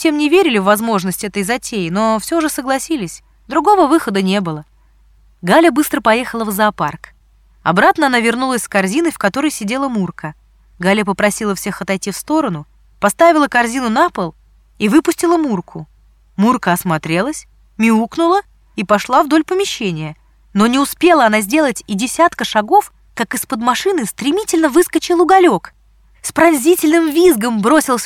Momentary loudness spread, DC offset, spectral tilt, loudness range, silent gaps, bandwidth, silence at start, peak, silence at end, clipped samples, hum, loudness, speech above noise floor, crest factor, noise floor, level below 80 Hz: 11 LU; under 0.1%; -4.5 dB/octave; 3 LU; none; 17.5 kHz; 0 s; 0 dBFS; 0 s; under 0.1%; none; -14 LUFS; 36 dB; 14 dB; -49 dBFS; -48 dBFS